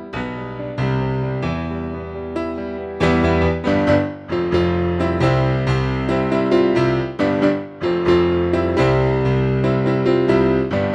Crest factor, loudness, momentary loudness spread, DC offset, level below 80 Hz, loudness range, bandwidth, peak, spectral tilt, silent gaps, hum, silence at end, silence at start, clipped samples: 16 dB; -19 LUFS; 10 LU; under 0.1%; -36 dBFS; 3 LU; 8.4 kHz; -2 dBFS; -8 dB/octave; none; none; 0 s; 0 s; under 0.1%